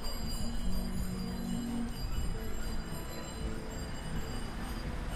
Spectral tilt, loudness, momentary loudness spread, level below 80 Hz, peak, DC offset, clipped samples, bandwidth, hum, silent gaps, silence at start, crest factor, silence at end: -5 dB/octave; -39 LUFS; 4 LU; -38 dBFS; -22 dBFS; under 0.1%; under 0.1%; 15.5 kHz; none; none; 0 s; 14 dB; 0 s